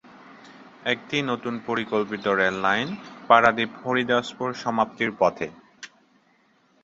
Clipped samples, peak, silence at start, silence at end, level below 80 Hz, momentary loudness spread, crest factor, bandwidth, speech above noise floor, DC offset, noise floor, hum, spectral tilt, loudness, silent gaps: under 0.1%; 0 dBFS; 0.3 s; 0.95 s; -62 dBFS; 16 LU; 24 dB; 7.8 kHz; 39 dB; under 0.1%; -62 dBFS; none; -5 dB/octave; -24 LUFS; none